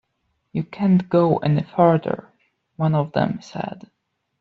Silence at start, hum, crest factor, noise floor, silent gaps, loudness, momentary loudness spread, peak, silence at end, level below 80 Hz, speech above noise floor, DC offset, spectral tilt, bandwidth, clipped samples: 0.55 s; none; 18 dB; -72 dBFS; none; -21 LUFS; 13 LU; -4 dBFS; 0.6 s; -58 dBFS; 52 dB; under 0.1%; -8 dB/octave; 6.8 kHz; under 0.1%